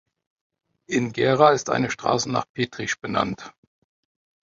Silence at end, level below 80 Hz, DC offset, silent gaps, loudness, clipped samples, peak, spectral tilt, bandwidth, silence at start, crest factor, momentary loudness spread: 1.05 s; -60 dBFS; under 0.1%; 2.49-2.55 s; -22 LUFS; under 0.1%; -2 dBFS; -4.5 dB/octave; 7.8 kHz; 0.9 s; 22 dB; 11 LU